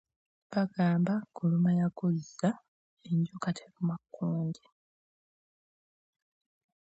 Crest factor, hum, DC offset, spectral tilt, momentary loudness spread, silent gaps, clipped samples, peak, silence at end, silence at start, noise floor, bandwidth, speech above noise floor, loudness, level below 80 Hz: 18 dB; none; under 0.1%; -8 dB/octave; 9 LU; 2.68-2.97 s; under 0.1%; -16 dBFS; 2.35 s; 0.5 s; under -90 dBFS; 8.2 kHz; over 60 dB; -32 LUFS; -76 dBFS